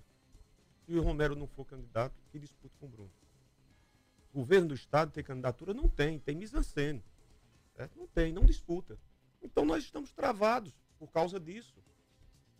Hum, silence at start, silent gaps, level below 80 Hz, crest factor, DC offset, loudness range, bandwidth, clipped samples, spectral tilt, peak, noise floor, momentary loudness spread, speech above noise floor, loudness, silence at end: none; 0.9 s; none; -38 dBFS; 24 dB; under 0.1%; 6 LU; 10.5 kHz; under 0.1%; -6.5 dB/octave; -12 dBFS; -67 dBFS; 23 LU; 34 dB; -34 LUFS; 1 s